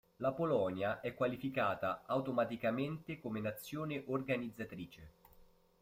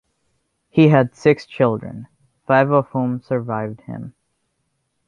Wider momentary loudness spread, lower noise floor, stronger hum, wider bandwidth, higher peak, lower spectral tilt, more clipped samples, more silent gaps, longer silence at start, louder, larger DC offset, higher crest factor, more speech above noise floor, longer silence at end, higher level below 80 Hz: second, 10 LU vs 20 LU; second, -65 dBFS vs -71 dBFS; neither; first, 16 kHz vs 7.4 kHz; second, -22 dBFS vs -2 dBFS; second, -7 dB/octave vs -8.5 dB/octave; neither; neither; second, 0.2 s vs 0.75 s; second, -38 LUFS vs -18 LUFS; neither; about the same, 18 dB vs 18 dB; second, 27 dB vs 54 dB; second, 0.35 s vs 1 s; second, -70 dBFS vs -58 dBFS